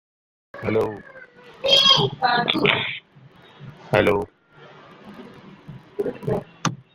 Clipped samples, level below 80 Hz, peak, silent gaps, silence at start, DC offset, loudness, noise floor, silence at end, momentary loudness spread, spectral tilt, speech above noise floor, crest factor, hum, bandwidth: under 0.1%; -54 dBFS; 0 dBFS; none; 0.55 s; under 0.1%; -20 LUFS; -50 dBFS; 0.2 s; 20 LU; -4 dB/octave; 30 dB; 24 dB; none; 16 kHz